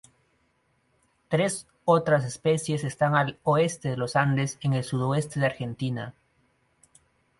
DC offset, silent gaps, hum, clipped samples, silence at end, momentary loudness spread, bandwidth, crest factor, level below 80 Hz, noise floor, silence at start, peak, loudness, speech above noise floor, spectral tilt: under 0.1%; none; none; under 0.1%; 1.3 s; 7 LU; 11.5 kHz; 20 dB; -62 dBFS; -69 dBFS; 1.3 s; -8 dBFS; -26 LUFS; 44 dB; -5.5 dB/octave